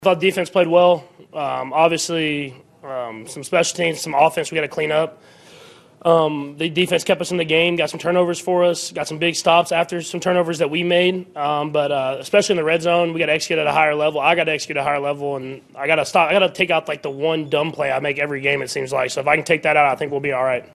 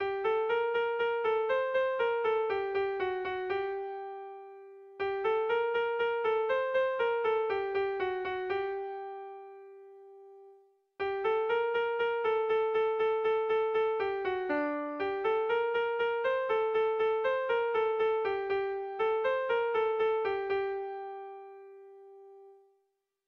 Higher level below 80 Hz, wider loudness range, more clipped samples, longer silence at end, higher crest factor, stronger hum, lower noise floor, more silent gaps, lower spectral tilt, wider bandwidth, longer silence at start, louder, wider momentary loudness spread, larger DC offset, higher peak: first, -62 dBFS vs -70 dBFS; about the same, 3 LU vs 5 LU; neither; second, 0.1 s vs 0.75 s; first, 18 dB vs 12 dB; neither; second, -45 dBFS vs -79 dBFS; neither; second, -4 dB/octave vs -5.5 dB/octave; first, 13 kHz vs 5.6 kHz; about the same, 0 s vs 0 s; first, -19 LUFS vs -31 LUFS; second, 8 LU vs 12 LU; neither; first, 0 dBFS vs -20 dBFS